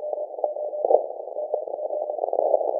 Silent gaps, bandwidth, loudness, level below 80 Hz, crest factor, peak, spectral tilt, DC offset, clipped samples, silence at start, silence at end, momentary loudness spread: none; 1.1 kHz; -26 LUFS; under -90 dBFS; 24 dB; -2 dBFS; -9 dB/octave; under 0.1%; under 0.1%; 0 s; 0 s; 8 LU